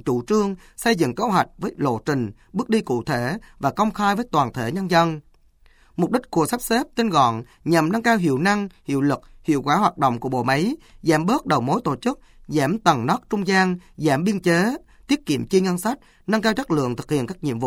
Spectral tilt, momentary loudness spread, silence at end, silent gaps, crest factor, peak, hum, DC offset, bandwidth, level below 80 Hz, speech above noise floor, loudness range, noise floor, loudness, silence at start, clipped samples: -5.5 dB/octave; 7 LU; 0 s; none; 18 dB; -4 dBFS; none; under 0.1%; 19 kHz; -50 dBFS; 33 dB; 2 LU; -54 dBFS; -22 LUFS; 0.05 s; under 0.1%